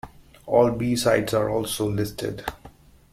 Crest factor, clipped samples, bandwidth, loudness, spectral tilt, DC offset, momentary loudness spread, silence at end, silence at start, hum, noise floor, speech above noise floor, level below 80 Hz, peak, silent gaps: 20 dB; under 0.1%; 16.5 kHz; -23 LUFS; -5 dB/octave; under 0.1%; 11 LU; 0.45 s; 0.05 s; none; -49 dBFS; 26 dB; -50 dBFS; -6 dBFS; none